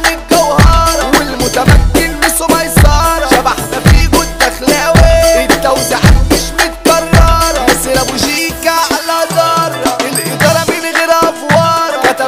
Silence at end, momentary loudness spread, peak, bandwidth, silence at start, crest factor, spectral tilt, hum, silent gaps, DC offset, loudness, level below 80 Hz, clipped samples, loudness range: 0 s; 5 LU; 0 dBFS; 16.5 kHz; 0 s; 10 dB; -4 dB/octave; none; none; 0.8%; -9 LUFS; -16 dBFS; 0.3%; 2 LU